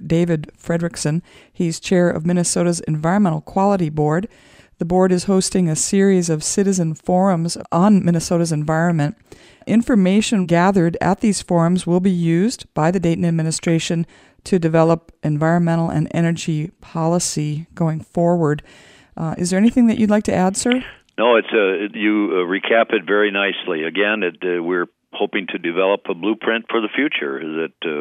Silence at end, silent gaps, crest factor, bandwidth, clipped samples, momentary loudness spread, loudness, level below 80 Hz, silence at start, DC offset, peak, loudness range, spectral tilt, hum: 0 s; none; 16 dB; 14 kHz; under 0.1%; 8 LU; -18 LUFS; -50 dBFS; 0 s; under 0.1%; -2 dBFS; 3 LU; -5.5 dB/octave; none